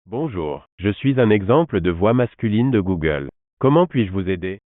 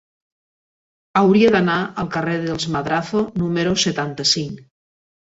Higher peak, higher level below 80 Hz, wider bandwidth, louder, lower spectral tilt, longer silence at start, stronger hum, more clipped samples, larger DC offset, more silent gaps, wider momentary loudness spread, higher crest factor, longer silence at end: about the same, -4 dBFS vs -4 dBFS; first, -46 dBFS vs -52 dBFS; second, 4 kHz vs 8 kHz; about the same, -19 LUFS vs -19 LUFS; first, -7 dB/octave vs -4.5 dB/octave; second, 0.1 s vs 1.15 s; neither; neither; neither; first, 0.72-0.78 s, 3.53-3.57 s vs none; about the same, 9 LU vs 9 LU; about the same, 16 dB vs 18 dB; second, 0.1 s vs 0.75 s